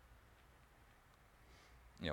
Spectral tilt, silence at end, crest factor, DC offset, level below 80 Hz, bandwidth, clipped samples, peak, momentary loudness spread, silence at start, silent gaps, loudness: -5.5 dB/octave; 0 s; 28 dB; under 0.1%; -68 dBFS; 18 kHz; under 0.1%; -26 dBFS; 6 LU; 0 s; none; -60 LUFS